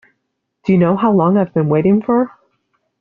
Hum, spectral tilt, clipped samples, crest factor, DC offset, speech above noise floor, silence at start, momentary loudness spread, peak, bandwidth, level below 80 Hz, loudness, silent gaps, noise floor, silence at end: none; -9 dB/octave; under 0.1%; 12 dB; under 0.1%; 59 dB; 0.65 s; 5 LU; -2 dBFS; 4.3 kHz; -54 dBFS; -15 LUFS; none; -72 dBFS; 0.7 s